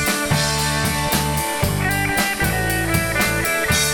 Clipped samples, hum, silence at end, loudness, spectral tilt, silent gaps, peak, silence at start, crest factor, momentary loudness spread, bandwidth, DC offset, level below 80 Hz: under 0.1%; none; 0 s; -19 LUFS; -3.5 dB/octave; none; -4 dBFS; 0 s; 16 dB; 2 LU; 19 kHz; under 0.1%; -32 dBFS